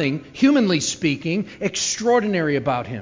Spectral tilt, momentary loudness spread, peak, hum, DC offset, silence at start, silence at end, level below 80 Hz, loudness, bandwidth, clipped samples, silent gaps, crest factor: -4.5 dB/octave; 7 LU; -6 dBFS; none; under 0.1%; 0 s; 0 s; -54 dBFS; -20 LUFS; 7.6 kHz; under 0.1%; none; 14 dB